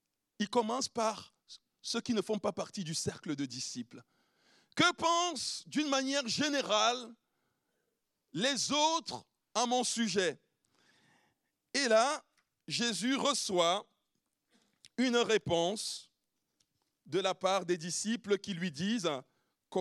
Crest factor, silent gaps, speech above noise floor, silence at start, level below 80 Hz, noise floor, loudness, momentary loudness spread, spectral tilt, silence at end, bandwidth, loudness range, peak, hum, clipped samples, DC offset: 20 dB; none; 51 dB; 0.4 s; -78 dBFS; -83 dBFS; -33 LUFS; 12 LU; -3 dB/octave; 0 s; 13.5 kHz; 4 LU; -14 dBFS; none; under 0.1%; under 0.1%